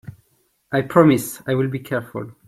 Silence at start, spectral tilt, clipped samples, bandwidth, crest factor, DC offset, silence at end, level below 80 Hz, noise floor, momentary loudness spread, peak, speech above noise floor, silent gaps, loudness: 0.05 s; -6.5 dB/octave; under 0.1%; 16 kHz; 18 dB; under 0.1%; 0.15 s; -58 dBFS; -64 dBFS; 12 LU; -2 dBFS; 45 dB; none; -19 LUFS